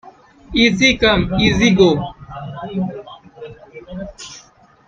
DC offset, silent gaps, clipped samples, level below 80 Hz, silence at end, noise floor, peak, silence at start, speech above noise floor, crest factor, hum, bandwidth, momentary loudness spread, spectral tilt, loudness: under 0.1%; none; under 0.1%; -36 dBFS; 0.5 s; -47 dBFS; 0 dBFS; 0.05 s; 33 dB; 18 dB; none; 7.6 kHz; 23 LU; -5 dB/octave; -15 LUFS